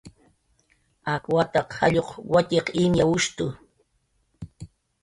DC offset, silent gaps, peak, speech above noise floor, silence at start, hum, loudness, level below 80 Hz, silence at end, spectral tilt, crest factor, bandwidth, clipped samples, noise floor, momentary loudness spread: under 0.1%; none; -6 dBFS; 47 dB; 0.05 s; none; -23 LUFS; -50 dBFS; 0.35 s; -5 dB/octave; 18 dB; 11.5 kHz; under 0.1%; -70 dBFS; 21 LU